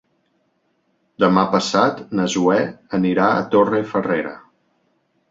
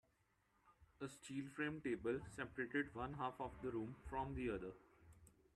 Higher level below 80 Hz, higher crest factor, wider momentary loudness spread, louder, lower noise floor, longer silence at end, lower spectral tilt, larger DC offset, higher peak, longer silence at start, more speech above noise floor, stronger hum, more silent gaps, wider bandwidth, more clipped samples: first, -60 dBFS vs -66 dBFS; about the same, 18 dB vs 18 dB; second, 6 LU vs 9 LU; first, -18 LUFS vs -47 LUFS; second, -66 dBFS vs -81 dBFS; first, 0.95 s vs 0.25 s; about the same, -5.5 dB/octave vs -6 dB/octave; neither; first, -2 dBFS vs -30 dBFS; first, 1.2 s vs 0.65 s; first, 48 dB vs 34 dB; neither; neither; second, 7.8 kHz vs 13 kHz; neither